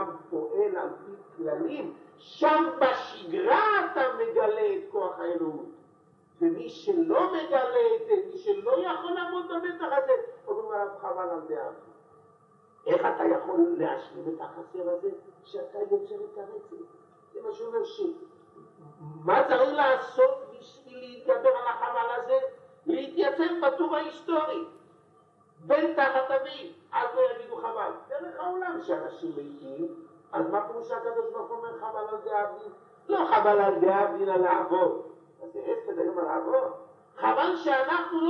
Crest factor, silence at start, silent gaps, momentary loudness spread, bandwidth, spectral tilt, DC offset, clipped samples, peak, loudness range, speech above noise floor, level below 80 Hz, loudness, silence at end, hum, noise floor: 18 dB; 0 s; none; 16 LU; 6.4 kHz; -6.5 dB/octave; under 0.1%; under 0.1%; -10 dBFS; 8 LU; 33 dB; -84 dBFS; -28 LUFS; 0 s; none; -61 dBFS